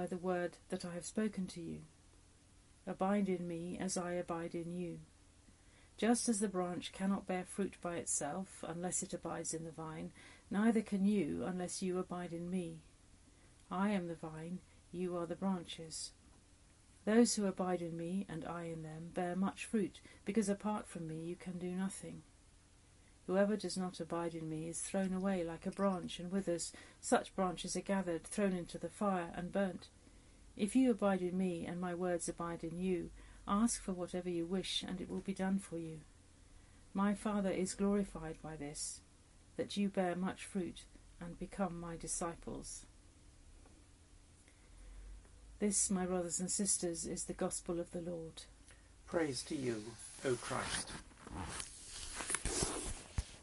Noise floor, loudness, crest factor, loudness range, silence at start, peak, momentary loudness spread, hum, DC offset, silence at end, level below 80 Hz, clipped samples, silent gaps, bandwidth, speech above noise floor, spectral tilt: -65 dBFS; -39 LUFS; 22 dB; 5 LU; 0 s; -18 dBFS; 13 LU; none; under 0.1%; 0 s; -60 dBFS; under 0.1%; none; 11.5 kHz; 26 dB; -4.5 dB/octave